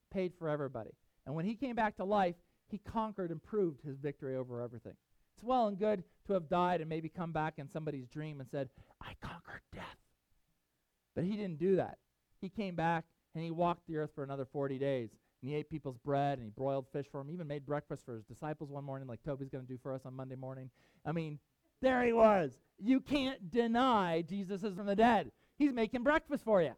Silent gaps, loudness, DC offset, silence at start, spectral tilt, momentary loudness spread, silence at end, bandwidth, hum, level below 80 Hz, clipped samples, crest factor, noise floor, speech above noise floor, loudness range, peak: none; -36 LUFS; under 0.1%; 0.1 s; -7.5 dB/octave; 17 LU; 0 s; 13.5 kHz; none; -64 dBFS; under 0.1%; 22 dB; -83 dBFS; 47 dB; 11 LU; -16 dBFS